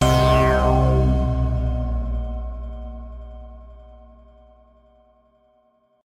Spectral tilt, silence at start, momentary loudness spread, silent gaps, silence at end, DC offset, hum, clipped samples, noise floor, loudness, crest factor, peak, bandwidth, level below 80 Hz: -6.5 dB/octave; 0 s; 23 LU; none; 2.05 s; under 0.1%; none; under 0.1%; -62 dBFS; -20 LUFS; 18 dB; -4 dBFS; 14 kHz; -26 dBFS